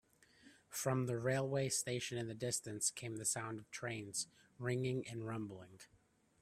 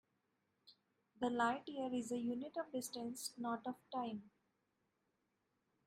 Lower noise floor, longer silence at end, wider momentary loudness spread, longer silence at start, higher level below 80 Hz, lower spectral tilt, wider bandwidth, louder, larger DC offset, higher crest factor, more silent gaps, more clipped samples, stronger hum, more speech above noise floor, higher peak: second, -67 dBFS vs -85 dBFS; second, 0.55 s vs 1.6 s; about the same, 9 LU vs 8 LU; second, 0.45 s vs 0.65 s; first, -76 dBFS vs -86 dBFS; about the same, -4 dB/octave vs -3.5 dB/octave; about the same, 15.5 kHz vs 15.5 kHz; about the same, -41 LUFS vs -43 LUFS; neither; about the same, 22 dB vs 20 dB; neither; neither; neither; second, 26 dB vs 42 dB; first, -20 dBFS vs -26 dBFS